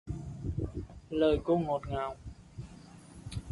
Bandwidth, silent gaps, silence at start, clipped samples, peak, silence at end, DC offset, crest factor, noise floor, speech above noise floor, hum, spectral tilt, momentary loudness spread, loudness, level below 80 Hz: 11.5 kHz; none; 0.05 s; under 0.1%; -16 dBFS; 0 s; under 0.1%; 18 dB; -52 dBFS; 22 dB; none; -7.5 dB/octave; 21 LU; -33 LUFS; -46 dBFS